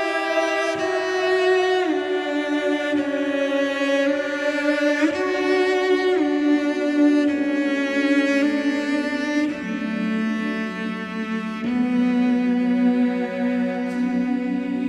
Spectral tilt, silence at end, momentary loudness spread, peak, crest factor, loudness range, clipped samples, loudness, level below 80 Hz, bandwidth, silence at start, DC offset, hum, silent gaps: -5 dB/octave; 0 s; 6 LU; -8 dBFS; 14 dB; 4 LU; under 0.1%; -21 LUFS; -68 dBFS; 11 kHz; 0 s; under 0.1%; none; none